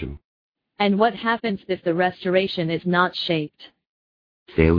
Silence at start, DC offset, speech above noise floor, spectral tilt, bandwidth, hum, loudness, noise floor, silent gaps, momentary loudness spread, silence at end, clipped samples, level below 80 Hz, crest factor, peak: 0 s; under 0.1%; over 69 dB; -8.5 dB/octave; 5.4 kHz; none; -22 LUFS; under -90 dBFS; 0.24-0.52 s, 3.89-4.46 s; 6 LU; 0 s; under 0.1%; -40 dBFS; 20 dB; -2 dBFS